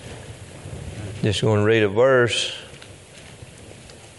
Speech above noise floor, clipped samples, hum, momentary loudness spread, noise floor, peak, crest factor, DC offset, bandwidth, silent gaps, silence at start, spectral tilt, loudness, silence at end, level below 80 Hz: 25 dB; under 0.1%; none; 25 LU; -43 dBFS; -6 dBFS; 18 dB; under 0.1%; 11.5 kHz; none; 0 s; -5 dB/octave; -19 LUFS; 0.05 s; -52 dBFS